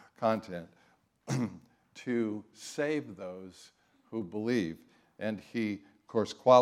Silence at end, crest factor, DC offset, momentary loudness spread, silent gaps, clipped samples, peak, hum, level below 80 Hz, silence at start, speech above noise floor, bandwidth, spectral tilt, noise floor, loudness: 0 s; 24 dB; under 0.1%; 17 LU; none; under 0.1%; -10 dBFS; none; -78 dBFS; 0.2 s; 37 dB; 14 kHz; -6 dB/octave; -68 dBFS; -34 LUFS